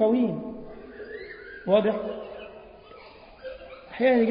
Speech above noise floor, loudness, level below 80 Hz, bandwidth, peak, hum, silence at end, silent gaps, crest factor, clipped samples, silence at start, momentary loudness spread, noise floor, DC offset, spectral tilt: 26 dB; -26 LUFS; -58 dBFS; 5.2 kHz; -8 dBFS; none; 0 s; none; 18 dB; under 0.1%; 0 s; 24 LU; -48 dBFS; under 0.1%; -10.5 dB/octave